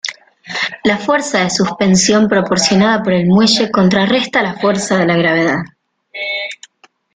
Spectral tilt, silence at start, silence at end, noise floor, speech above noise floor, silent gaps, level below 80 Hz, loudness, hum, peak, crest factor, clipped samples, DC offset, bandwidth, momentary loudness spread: -4.5 dB/octave; 0.05 s; 0.6 s; -51 dBFS; 39 dB; none; -50 dBFS; -13 LUFS; none; 0 dBFS; 14 dB; under 0.1%; under 0.1%; 9.6 kHz; 13 LU